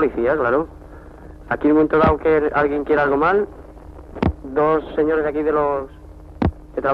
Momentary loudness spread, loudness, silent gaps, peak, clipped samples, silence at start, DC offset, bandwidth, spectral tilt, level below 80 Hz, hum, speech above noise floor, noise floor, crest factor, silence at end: 10 LU; -19 LUFS; none; -2 dBFS; under 0.1%; 0 s; under 0.1%; 5.6 kHz; -9 dB/octave; -36 dBFS; none; 21 dB; -39 dBFS; 16 dB; 0 s